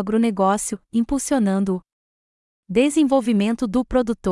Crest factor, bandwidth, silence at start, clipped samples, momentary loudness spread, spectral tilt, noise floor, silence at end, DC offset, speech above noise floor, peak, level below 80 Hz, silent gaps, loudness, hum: 16 dB; 12 kHz; 0 s; under 0.1%; 6 LU; -5.5 dB/octave; under -90 dBFS; 0 s; under 0.1%; over 70 dB; -6 dBFS; -44 dBFS; 1.93-2.63 s; -20 LUFS; none